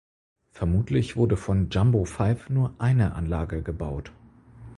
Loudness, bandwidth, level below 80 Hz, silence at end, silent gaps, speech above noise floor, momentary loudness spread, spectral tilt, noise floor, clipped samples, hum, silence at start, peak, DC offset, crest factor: -25 LUFS; 11.5 kHz; -38 dBFS; 0.05 s; none; 23 dB; 9 LU; -8 dB/octave; -47 dBFS; under 0.1%; none; 0.55 s; -10 dBFS; under 0.1%; 16 dB